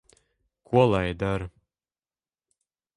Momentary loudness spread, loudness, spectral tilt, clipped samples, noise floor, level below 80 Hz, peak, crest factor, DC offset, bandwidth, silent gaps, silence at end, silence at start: 12 LU; -25 LUFS; -7.5 dB/octave; under 0.1%; under -90 dBFS; -48 dBFS; -6 dBFS; 22 dB; under 0.1%; 11 kHz; none; 1.5 s; 0.7 s